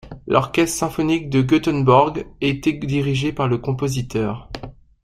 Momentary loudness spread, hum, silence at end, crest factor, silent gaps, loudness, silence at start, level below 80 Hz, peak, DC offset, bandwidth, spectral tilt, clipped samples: 10 LU; none; 0.3 s; 18 dB; none; -19 LUFS; 0.05 s; -44 dBFS; -2 dBFS; under 0.1%; 15.5 kHz; -6 dB/octave; under 0.1%